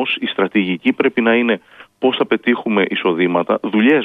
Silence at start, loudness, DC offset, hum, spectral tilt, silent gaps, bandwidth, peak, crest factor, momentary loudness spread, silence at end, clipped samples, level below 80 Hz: 0 s; -16 LUFS; under 0.1%; none; -7.5 dB/octave; none; 4.3 kHz; -2 dBFS; 14 dB; 4 LU; 0 s; under 0.1%; -66 dBFS